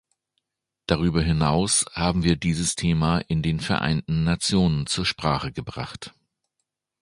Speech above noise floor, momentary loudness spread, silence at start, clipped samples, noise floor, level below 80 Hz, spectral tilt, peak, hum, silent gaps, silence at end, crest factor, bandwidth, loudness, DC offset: 58 dB; 12 LU; 0.9 s; under 0.1%; -81 dBFS; -40 dBFS; -4.5 dB/octave; -2 dBFS; none; none; 0.9 s; 22 dB; 11.5 kHz; -23 LUFS; under 0.1%